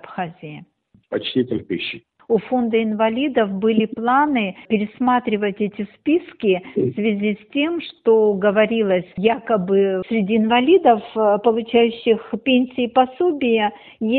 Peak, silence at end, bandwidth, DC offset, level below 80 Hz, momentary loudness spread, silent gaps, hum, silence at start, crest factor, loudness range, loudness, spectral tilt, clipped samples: -2 dBFS; 0 s; 4.5 kHz; under 0.1%; -60 dBFS; 9 LU; none; none; 0.05 s; 16 dB; 4 LU; -19 LUFS; -4 dB/octave; under 0.1%